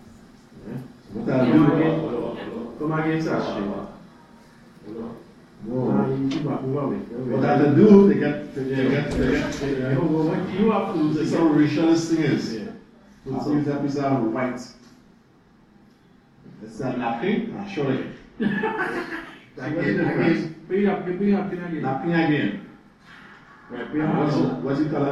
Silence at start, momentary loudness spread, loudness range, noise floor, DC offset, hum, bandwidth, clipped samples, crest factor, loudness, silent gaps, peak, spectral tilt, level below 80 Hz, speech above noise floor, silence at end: 0.05 s; 17 LU; 10 LU; -55 dBFS; under 0.1%; none; 10 kHz; under 0.1%; 22 dB; -22 LUFS; none; -2 dBFS; -7.5 dB/octave; -50 dBFS; 33 dB; 0 s